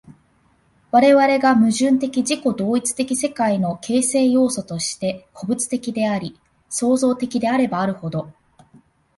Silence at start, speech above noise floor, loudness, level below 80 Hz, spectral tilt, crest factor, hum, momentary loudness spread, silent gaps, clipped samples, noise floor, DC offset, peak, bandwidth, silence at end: 0.1 s; 41 dB; -19 LUFS; -60 dBFS; -4.5 dB/octave; 16 dB; none; 12 LU; none; under 0.1%; -59 dBFS; under 0.1%; -2 dBFS; 12 kHz; 0.85 s